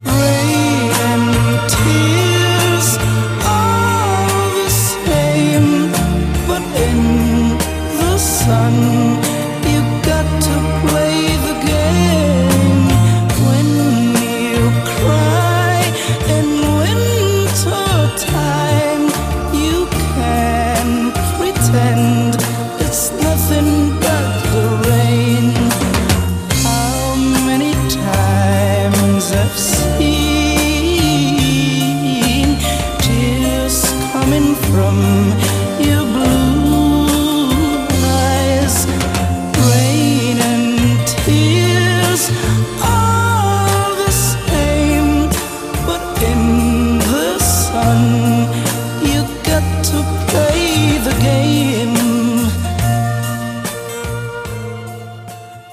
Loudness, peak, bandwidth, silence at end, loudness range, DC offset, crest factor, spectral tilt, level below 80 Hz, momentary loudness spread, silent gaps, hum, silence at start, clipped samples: -14 LUFS; 0 dBFS; 16 kHz; 0 s; 2 LU; under 0.1%; 14 dB; -5 dB/octave; -26 dBFS; 4 LU; none; none; 0 s; under 0.1%